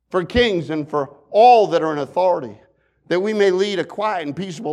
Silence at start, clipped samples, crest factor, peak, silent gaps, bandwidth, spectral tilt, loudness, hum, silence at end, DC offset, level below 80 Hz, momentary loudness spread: 0.15 s; under 0.1%; 16 dB; -2 dBFS; none; 10.5 kHz; -5.5 dB/octave; -18 LUFS; none; 0 s; under 0.1%; -44 dBFS; 13 LU